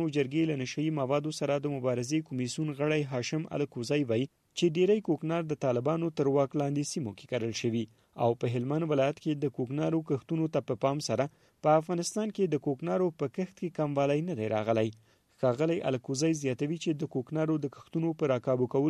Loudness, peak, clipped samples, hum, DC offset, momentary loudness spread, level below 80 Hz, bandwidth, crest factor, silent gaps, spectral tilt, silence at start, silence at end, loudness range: -31 LUFS; -12 dBFS; under 0.1%; none; under 0.1%; 6 LU; -72 dBFS; 13 kHz; 18 dB; none; -6 dB/octave; 0 s; 0 s; 2 LU